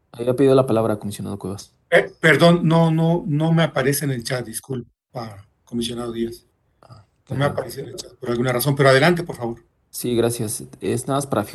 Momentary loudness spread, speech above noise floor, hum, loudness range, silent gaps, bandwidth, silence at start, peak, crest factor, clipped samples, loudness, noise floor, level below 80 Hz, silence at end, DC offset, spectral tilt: 17 LU; 29 dB; none; 10 LU; none; 12.5 kHz; 0.15 s; 0 dBFS; 20 dB; under 0.1%; -20 LUFS; -49 dBFS; -54 dBFS; 0 s; under 0.1%; -5.5 dB/octave